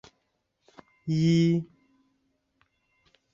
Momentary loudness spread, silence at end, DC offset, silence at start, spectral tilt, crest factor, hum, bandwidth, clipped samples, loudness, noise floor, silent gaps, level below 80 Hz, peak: 19 LU; 1.7 s; under 0.1%; 1.05 s; -7.5 dB/octave; 16 dB; none; 7.4 kHz; under 0.1%; -25 LUFS; -76 dBFS; none; -68 dBFS; -14 dBFS